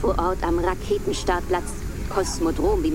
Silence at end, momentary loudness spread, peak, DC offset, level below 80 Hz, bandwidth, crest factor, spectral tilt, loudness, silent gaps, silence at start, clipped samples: 0 s; 5 LU; -8 dBFS; under 0.1%; -30 dBFS; 16.5 kHz; 16 dB; -5.5 dB/octave; -24 LUFS; none; 0 s; under 0.1%